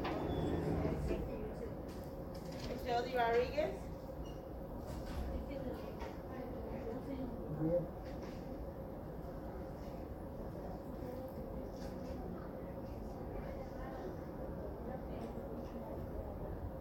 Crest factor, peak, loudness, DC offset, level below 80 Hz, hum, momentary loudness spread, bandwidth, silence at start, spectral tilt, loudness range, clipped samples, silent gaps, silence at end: 18 dB; -24 dBFS; -43 LUFS; under 0.1%; -50 dBFS; none; 10 LU; 17 kHz; 0 s; -7.5 dB/octave; 7 LU; under 0.1%; none; 0 s